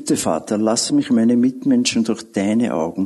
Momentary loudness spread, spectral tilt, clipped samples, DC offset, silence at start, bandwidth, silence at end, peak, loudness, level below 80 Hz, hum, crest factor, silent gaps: 5 LU; -4.5 dB/octave; under 0.1%; under 0.1%; 0 s; 12.5 kHz; 0 s; -4 dBFS; -18 LUFS; -56 dBFS; none; 14 dB; none